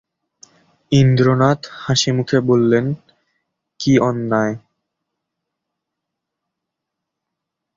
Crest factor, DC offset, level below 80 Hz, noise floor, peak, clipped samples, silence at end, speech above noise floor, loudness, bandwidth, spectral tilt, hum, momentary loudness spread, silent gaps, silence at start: 18 dB; under 0.1%; -52 dBFS; -81 dBFS; -2 dBFS; under 0.1%; 3.2 s; 66 dB; -16 LUFS; 7.6 kHz; -6 dB/octave; none; 10 LU; none; 0.9 s